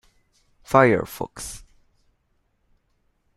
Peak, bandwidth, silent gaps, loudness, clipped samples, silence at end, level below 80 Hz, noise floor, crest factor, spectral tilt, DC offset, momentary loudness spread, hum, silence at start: -2 dBFS; 15 kHz; none; -21 LUFS; under 0.1%; 1.8 s; -52 dBFS; -69 dBFS; 24 dB; -5.5 dB/octave; under 0.1%; 19 LU; none; 0.7 s